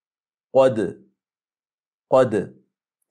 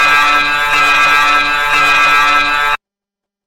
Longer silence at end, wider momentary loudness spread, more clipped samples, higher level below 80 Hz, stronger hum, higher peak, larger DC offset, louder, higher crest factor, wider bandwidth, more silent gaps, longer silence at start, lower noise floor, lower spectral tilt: about the same, 0.65 s vs 0.7 s; first, 11 LU vs 5 LU; neither; second, -68 dBFS vs -36 dBFS; neither; second, -6 dBFS vs 0 dBFS; neither; second, -20 LUFS vs -9 LUFS; first, 18 dB vs 12 dB; second, 9.6 kHz vs 17 kHz; first, 1.74-1.78 s vs none; first, 0.55 s vs 0 s; first, under -90 dBFS vs -84 dBFS; first, -7 dB/octave vs -0.5 dB/octave